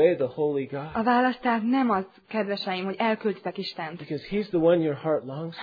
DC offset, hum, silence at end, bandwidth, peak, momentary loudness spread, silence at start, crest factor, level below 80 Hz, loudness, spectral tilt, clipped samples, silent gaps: under 0.1%; none; 0 s; 5 kHz; -8 dBFS; 10 LU; 0 s; 16 dB; -62 dBFS; -26 LUFS; -8.5 dB/octave; under 0.1%; none